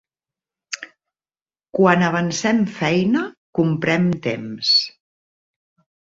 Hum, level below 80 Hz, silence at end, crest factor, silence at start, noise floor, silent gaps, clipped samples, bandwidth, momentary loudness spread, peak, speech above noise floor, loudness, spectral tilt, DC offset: none; -58 dBFS; 1.15 s; 20 dB; 0.7 s; under -90 dBFS; 3.37-3.53 s; under 0.1%; 7.8 kHz; 16 LU; -2 dBFS; over 72 dB; -19 LUFS; -5 dB/octave; under 0.1%